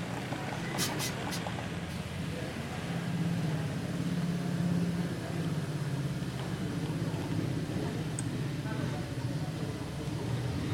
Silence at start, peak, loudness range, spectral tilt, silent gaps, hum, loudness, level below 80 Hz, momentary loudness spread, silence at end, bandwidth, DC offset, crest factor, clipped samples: 0 s; -16 dBFS; 2 LU; -5.5 dB/octave; none; none; -35 LUFS; -54 dBFS; 5 LU; 0 s; 17 kHz; under 0.1%; 18 dB; under 0.1%